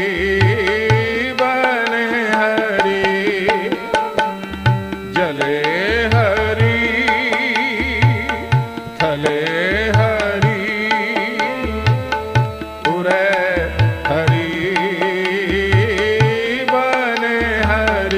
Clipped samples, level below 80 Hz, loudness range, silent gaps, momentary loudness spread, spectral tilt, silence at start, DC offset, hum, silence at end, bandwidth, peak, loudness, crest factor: under 0.1%; -36 dBFS; 2 LU; none; 4 LU; -6 dB/octave; 0 s; under 0.1%; none; 0 s; 15.5 kHz; 0 dBFS; -16 LUFS; 16 dB